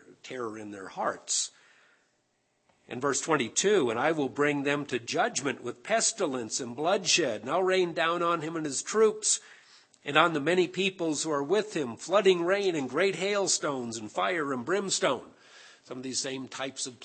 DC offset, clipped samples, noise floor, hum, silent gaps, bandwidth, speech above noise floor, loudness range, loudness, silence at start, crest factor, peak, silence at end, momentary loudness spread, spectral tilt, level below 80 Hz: under 0.1%; under 0.1%; -74 dBFS; none; none; 8.8 kHz; 45 dB; 3 LU; -28 LUFS; 0.1 s; 24 dB; -4 dBFS; 0 s; 11 LU; -2.5 dB/octave; -80 dBFS